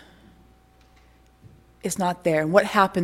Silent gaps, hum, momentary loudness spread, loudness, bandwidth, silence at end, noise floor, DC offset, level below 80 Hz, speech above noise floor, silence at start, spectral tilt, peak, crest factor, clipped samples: none; none; 11 LU; -22 LUFS; 16.5 kHz; 0 s; -55 dBFS; under 0.1%; -56 dBFS; 34 dB; 1.85 s; -5 dB/octave; -2 dBFS; 22 dB; under 0.1%